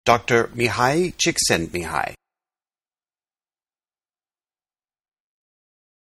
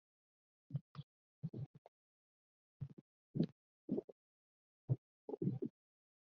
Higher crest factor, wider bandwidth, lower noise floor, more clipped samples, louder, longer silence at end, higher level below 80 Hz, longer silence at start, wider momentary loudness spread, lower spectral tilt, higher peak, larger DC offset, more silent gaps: about the same, 24 dB vs 24 dB; first, 13.5 kHz vs 5.4 kHz; about the same, under -90 dBFS vs under -90 dBFS; neither; first, -20 LUFS vs -46 LUFS; first, 4 s vs 0.65 s; first, -50 dBFS vs -82 dBFS; second, 0.05 s vs 0.7 s; second, 8 LU vs 17 LU; second, -3.5 dB/octave vs -11 dB/octave; first, 0 dBFS vs -24 dBFS; neither; second, none vs 0.81-0.95 s, 1.03-1.42 s, 1.66-2.80 s, 2.93-3.34 s, 3.52-3.88 s, 4.04-4.88 s, 4.98-5.28 s